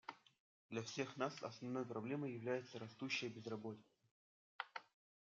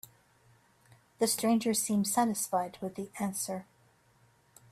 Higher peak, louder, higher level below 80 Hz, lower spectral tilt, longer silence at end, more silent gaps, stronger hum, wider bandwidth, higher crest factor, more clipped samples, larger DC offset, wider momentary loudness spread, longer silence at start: second, -26 dBFS vs -16 dBFS; second, -47 LUFS vs -31 LUFS; second, under -90 dBFS vs -74 dBFS; about the same, -4 dB/octave vs -4 dB/octave; second, 0.4 s vs 1.1 s; first, 0.40-0.69 s, 4.11-4.59 s vs none; neither; second, 7.6 kHz vs 15.5 kHz; about the same, 22 dB vs 18 dB; neither; neither; about the same, 10 LU vs 11 LU; second, 0.1 s vs 1.2 s